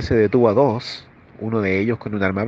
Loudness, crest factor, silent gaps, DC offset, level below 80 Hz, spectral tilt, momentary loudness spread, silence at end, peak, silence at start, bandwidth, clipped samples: -19 LUFS; 18 dB; none; under 0.1%; -46 dBFS; -8 dB/octave; 16 LU; 0 s; -2 dBFS; 0 s; 7.6 kHz; under 0.1%